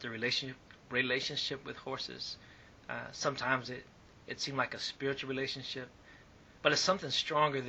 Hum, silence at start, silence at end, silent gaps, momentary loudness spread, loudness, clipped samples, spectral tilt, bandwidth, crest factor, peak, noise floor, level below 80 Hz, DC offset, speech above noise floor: none; 0 s; 0 s; none; 15 LU; -35 LUFS; under 0.1%; -3 dB/octave; 8.4 kHz; 26 dB; -10 dBFS; -58 dBFS; -68 dBFS; under 0.1%; 23 dB